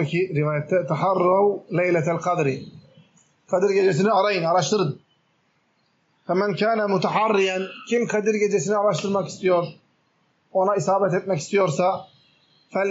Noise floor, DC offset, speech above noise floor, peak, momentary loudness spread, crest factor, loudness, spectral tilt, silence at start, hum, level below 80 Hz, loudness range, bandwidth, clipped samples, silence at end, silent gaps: -66 dBFS; under 0.1%; 45 dB; -8 dBFS; 7 LU; 14 dB; -22 LUFS; -5 dB/octave; 0 s; none; -74 dBFS; 2 LU; 8 kHz; under 0.1%; 0 s; none